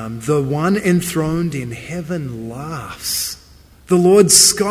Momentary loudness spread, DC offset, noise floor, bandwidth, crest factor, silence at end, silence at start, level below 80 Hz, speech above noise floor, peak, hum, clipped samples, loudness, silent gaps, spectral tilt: 19 LU; under 0.1%; -45 dBFS; 16 kHz; 16 dB; 0 s; 0 s; -44 dBFS; 29 dB; 0 dBFS; none; under 0.1%; -15 LUFS; none; -3.5 dB/octave